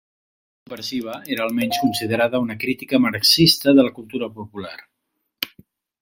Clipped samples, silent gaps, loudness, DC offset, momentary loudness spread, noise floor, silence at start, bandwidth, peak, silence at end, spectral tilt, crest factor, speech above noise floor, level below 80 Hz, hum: under 0.1%; none; -19 LUFS; under 0.1%; 19 LU; -76 dBFS; 0.7 s; 16.5 kHz; -2 dBFS; 0.55 s; -4 dB/octave; 18 dB; 56 dB; -56 dBFS; none